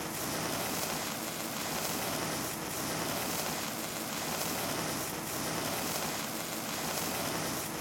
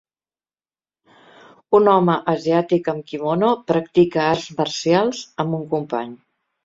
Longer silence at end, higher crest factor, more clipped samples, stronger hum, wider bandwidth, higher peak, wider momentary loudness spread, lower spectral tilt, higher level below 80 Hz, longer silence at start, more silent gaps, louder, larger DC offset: second, 0 s vs 0.5 s; about the same, 20 dB vs 18 dB; neither; neither; first, 17 kHz vs 7.8 kHz; second, -16 dBFS vs -2 dBFS; second, 2 LU vs 10 LU; second, -2.5 dB/octave vs -6 dB/octave; about the same, -62 dBFS vs -60 dBFS; second, 0 s vs 1.7 s; neither; second, -34 LUFS vs -19 LUFS; neither